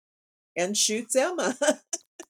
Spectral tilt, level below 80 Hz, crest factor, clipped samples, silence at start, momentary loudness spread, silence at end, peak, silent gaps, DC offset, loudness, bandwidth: -1.5 dB/octave; -88 dBFS; 20 dB; under 0.1%; 0.55 s; 10 LU; 0.1 s; -8 dBFS; 2.07-2.19 s; under 0.1%; -26 LUFS; 18.5 kHz